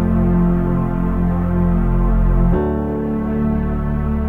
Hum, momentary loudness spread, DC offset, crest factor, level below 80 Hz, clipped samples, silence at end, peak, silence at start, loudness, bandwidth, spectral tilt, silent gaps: none; 5 LU; 1%; 12 dB; -20 dBFS; under 0.1%; 0 s; -4 dBFS; 0 s; -18 LUFS; 3.3 kHz; -11.5 dB/octave; none